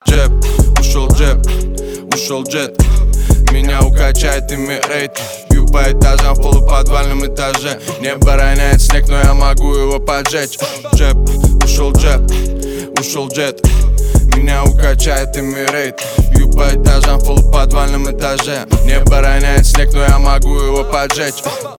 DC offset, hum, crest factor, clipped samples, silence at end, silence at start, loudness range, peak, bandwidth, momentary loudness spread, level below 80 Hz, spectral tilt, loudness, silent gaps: under 0.1%; none; 10 dB; under 0.1%; 0.05 s; 0.05 s; 1 LU; 0 dBFS; 16.5 kHz; 6 LU; -10 dBFS; -4.5 dB/octave; -13 LUFS; none